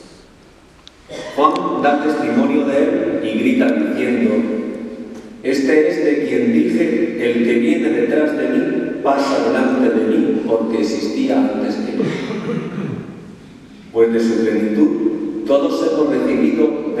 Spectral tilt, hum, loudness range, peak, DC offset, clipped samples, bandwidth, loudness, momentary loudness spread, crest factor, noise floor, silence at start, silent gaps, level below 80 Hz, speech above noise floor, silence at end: -6.5 dB/octave; none; 4 LU; 0 dBFS; under 0.1%; under 0.1%; 12.5 kHz; -17 LUFS; 9 LU; 16 dB; -45 dBFS; 1.1 s; none; -56 dBFS; 30 dB; 0 s